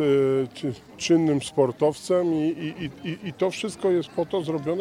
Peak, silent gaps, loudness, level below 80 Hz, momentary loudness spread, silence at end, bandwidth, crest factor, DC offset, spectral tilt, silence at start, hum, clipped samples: -8 dBFS; none; -25 LUFS; -62 dBFS; 11 LU; 0 s; 13 kHz; 16 dB; under 0.1%; -6 dB/octave; 0 s; none; under 0.1%